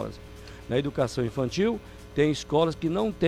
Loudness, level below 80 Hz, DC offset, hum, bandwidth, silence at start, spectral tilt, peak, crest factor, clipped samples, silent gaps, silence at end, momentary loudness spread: -27 LUFS; -48 dBFS; under 0.1%; none; 15.5 kHz; 0 s; -6 dB/octave; -10 dBFS; 16 dB; under 0.1%; none; 0 s; 14 LU